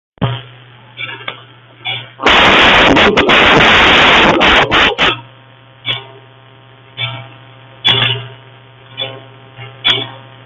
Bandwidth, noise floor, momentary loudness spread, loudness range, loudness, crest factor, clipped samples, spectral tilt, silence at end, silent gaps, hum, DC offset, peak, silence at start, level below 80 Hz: 14 kHz; -41 dBFS; 19 LU; 11 LU; -9 LUFS; 12 dB; under 0.1%; -4 dB/octave; 0.25 s; none; none; under 0.1%; 0 dBFS; 0.2 s; -34 dBFS